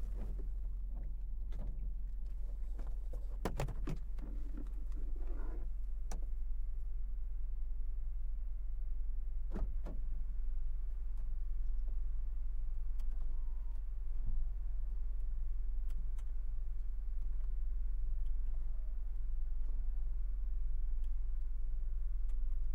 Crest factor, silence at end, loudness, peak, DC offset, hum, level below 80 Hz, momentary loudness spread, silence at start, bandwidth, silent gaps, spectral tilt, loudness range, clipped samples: 12 dB; 0 s; -45 LUFS; -24 dBFS; under 0.1%; none; -36 dBFS; 3 LU; 0 s; 2.8 kHz; none; -7.5 dB/octave; 2 LU; under 0.1%